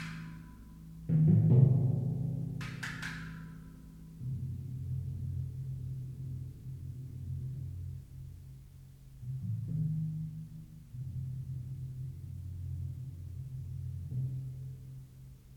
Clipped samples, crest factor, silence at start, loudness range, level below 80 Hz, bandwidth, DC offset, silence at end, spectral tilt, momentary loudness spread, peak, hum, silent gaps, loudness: under 0.1%; 22 dB; 0 s; 12 LU; -56 dBFS; 9.8 kHz; under 0.1%; 0 s; -8.5 dB/octave; 21 LU; -12 dBFS; none; none; -36 LUFS